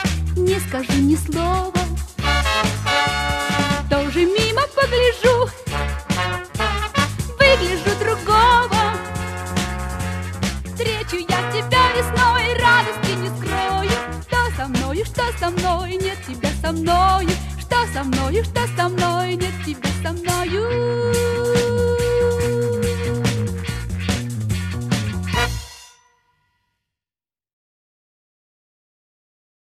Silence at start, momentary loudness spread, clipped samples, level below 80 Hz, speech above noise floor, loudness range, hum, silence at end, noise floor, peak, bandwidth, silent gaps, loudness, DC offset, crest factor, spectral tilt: 0 s; 9 LU; under 0.1%; -32 dBFS; over 70 dB; 6 LU; none; 3.85 s; under -90 dBFS; 0 dBFS; 14 kHz; none; -19 LUFS; under 0.1%; 20 dB; -4.5 dB/octave